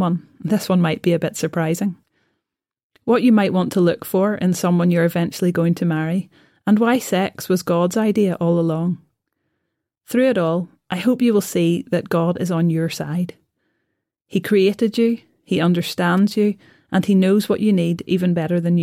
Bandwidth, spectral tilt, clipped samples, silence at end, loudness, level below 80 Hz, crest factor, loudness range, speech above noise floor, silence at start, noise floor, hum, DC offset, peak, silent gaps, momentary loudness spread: 16 kHz; -6.5 dB/octave; under 0.1%; 0 s; -19 LUFS; -62 dBFS; 14 dB; 3 LU; 62 dB; 0 s; -80 dBFS; none; under 0.1%; -6 dBFS; 2.83-2.90 s; 8 LU